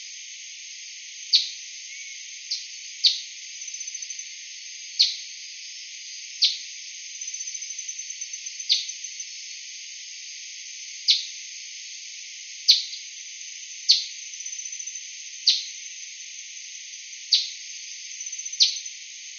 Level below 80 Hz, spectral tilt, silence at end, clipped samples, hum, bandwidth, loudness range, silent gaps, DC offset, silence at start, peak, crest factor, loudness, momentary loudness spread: under -90 dBFS; 13.5 dB/octave; 0 s; under 0.1%; none; 7.2 kHz; 5 LU; none; under 0.1%; 0 s; -2 dBFS; 28 dB; -26 LUFS; 16 LU